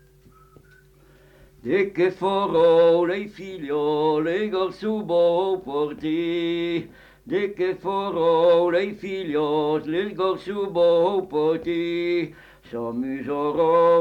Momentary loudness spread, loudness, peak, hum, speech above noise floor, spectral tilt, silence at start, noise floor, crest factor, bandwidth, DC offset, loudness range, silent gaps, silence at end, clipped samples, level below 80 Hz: 11 LU; -22 LUFS; -8 dBFS; none; 32 dB; -7 dB/octave; 1.65 s; -53 dBFS; 14 dB; 7 kHz; under 0.1%; 3 LU; none; 0 s; under 0.1%; -58 dBFS